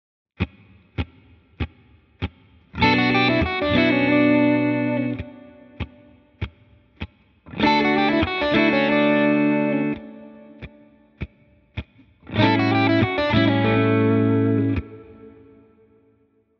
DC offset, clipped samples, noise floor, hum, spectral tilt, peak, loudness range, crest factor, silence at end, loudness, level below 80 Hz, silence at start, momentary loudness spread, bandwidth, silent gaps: under 0.1%; under 0.1%; -62 dBFS; none; -8 dB/octave; -6 dBFS; 6 LU; 16 dB; 1.3 s; -19 LUFS; -42 dBFS; 0.4 s; 20 LU; 6.2 kHz; none